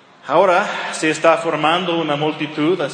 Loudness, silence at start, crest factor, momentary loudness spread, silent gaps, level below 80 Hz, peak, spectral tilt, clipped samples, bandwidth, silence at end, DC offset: -17 LUFS; 0.25 s; 18 dB; 6 LU; none; -74 dBFS; 0 dBFS; -4.5 dB/octave; under 0.1%; 10 kHz; 0 s; under 0.1%